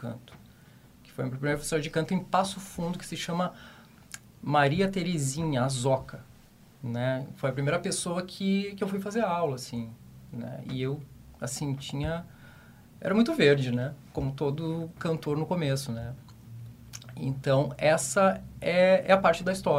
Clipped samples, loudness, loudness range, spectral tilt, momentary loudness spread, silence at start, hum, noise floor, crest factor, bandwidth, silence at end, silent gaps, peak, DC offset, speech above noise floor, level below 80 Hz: under 0.1%; -28 LUFS; 5 LU; -5.5 dB/octave; 20 LU; 0 s; none; -55 dBFS; 24 dB; 16 kHz; 0 s; none; -6 dBFS; under 0.1%; 27 dB; -54 dBFS